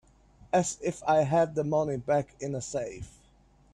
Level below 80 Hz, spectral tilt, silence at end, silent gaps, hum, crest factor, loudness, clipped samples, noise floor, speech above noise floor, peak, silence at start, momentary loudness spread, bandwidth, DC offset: -58 dBFS; -5.5 dB/octave; 0.65 s; none; none; 16 dB; -29 LUFS; under 0.1%; -61 dBFS; 33 dB; -14 dBFS; 0.55 s; 11 LU; 11.5 kHz; under 0.1%